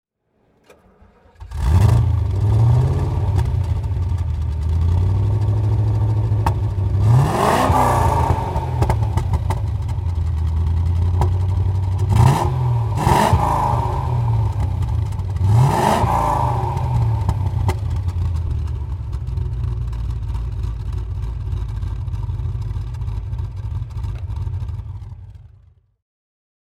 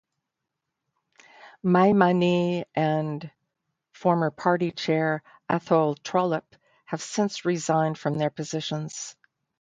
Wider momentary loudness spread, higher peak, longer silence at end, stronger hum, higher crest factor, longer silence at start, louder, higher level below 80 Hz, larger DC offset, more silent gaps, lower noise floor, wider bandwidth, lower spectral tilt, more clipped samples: about the same, 12 LU vs 12 LU; first, 0 dBFS vs -4 dBFS; first, 1.35 s vs 0.5 s; neither; about the same, 18 dB vs 22 dB; about the same, 1.4 s vs 1.45 s; first, -20 LUFS vs -25 LUFS; first, -26 dBFS vs -68 dBFS; neither; neither; second, -63 dBFS vs -84 dBFS; first, 15 kHz vs 9.4 kHz; first, -7.5 dB/octave vs -6 dB/octave; neither